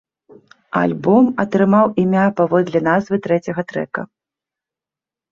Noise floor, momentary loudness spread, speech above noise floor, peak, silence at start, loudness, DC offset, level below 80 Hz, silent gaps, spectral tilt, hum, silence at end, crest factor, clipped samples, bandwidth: -89 dBFS; 10 LU; 72 dB; -2 dBFS; 0.75 s; -17 LUFS; under 0.1%; -58 dBFS; none; -8.5 dB/octave; none; 1.25 s; 16 dB; under 0.1%; 7.2 kHz